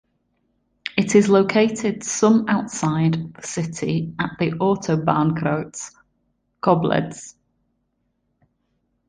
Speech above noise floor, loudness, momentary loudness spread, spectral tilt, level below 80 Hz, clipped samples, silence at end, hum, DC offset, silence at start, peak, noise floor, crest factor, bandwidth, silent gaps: 51 dB; -20 LUFS; 15 LU; -5.5 dB/octave; -56 dBFS; under 0.1%; 1.8 s; none; under 0.1%; 0.95 s; -2 dBFS; -71 dBFS; 20 dB; 10 kHz; none